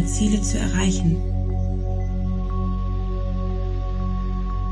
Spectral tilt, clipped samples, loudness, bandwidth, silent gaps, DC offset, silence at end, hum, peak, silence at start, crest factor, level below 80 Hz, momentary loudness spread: -6 dB/octave; under 0.1%; -24 LUFS; 11 kHz; none; under 0.1%; 0 s; none; -8 dBFS; 0 s; 14 dB; -24 dBFS; 6 LU